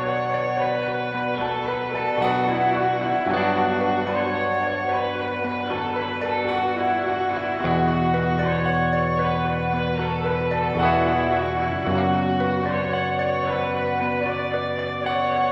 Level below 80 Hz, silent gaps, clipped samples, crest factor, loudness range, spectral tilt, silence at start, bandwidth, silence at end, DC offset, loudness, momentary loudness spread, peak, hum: -46 dBFS; none; under 0.1%; 14 dB; 2 LU; -8 dB/octave; 0 s; 7.4 kHz; 0 s; under 0.1%; -23 LUFS; 5 LU; -8 dBFS; none